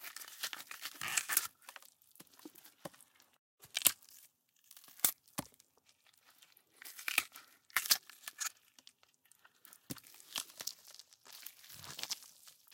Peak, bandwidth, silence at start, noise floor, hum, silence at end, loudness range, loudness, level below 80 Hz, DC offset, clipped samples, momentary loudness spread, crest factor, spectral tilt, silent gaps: -2 dBFS; 17 kHz; 0 s; -71 dBFS; none; 0.2 s; 8 LU; -37 LUFS; -84 dBFS; under 0.1%; under 0.1%; 26 LU; 42 dB; 1 dB/octave; 3.39-3.58 s